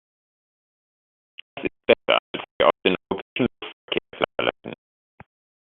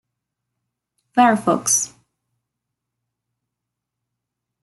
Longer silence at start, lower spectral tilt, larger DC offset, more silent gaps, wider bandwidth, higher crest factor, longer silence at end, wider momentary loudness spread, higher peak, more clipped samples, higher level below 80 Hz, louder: first, 1.55 s vs 1.15 s; about the same, -2 dB/octave vs -3 dB/octave; neither; first, 2.19-2.34 s, 2.51-2.60 s, 3.22-3.36 s, 3.73-3.88 s vs none; second, 4.3 kHz vs 12.5 kHz; about the same, 26 dB vs 22 dB; second, 0.85 s vs 2.75 s; first, 20 LU vs 8 LU; about the same, -2 dBFS vs -2 dBFS; neither; first, -58 dBFS vs -70 dBFS; second, -23 LUFS vs -17 LUFS